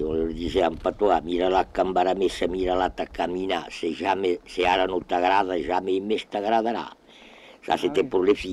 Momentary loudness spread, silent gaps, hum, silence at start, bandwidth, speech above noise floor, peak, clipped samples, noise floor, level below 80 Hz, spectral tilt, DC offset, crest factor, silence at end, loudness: 6 LU; none; none; 0 s; 12 kHz; 25 dB; -8 dBFS; under 0.1%; -49 dBFS; -46 dBFS; -5 dB/octave; under 0.1%; 16 dB; 0 s; -24 LUFS